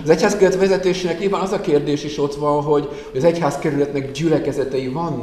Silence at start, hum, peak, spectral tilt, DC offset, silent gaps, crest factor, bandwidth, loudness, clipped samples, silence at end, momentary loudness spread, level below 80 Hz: 0 s; none; -2 dBFS; -6 dB/octave; 0.1%; none; 16 dB; 13.5 kHz; -19 LUFS; under 0.1%; 0 s; 7 LU; -46 dBFS